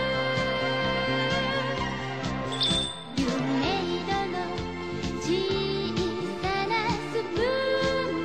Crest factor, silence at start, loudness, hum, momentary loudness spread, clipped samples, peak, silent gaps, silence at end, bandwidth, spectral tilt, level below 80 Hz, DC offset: 14 dB; 0 s; -27 LUFS; none; 6 LU; under 0.1%; -12 dBFS; none; 0 s; 14 kHz; -5 dB/octave; -46 dBFS; 0.3%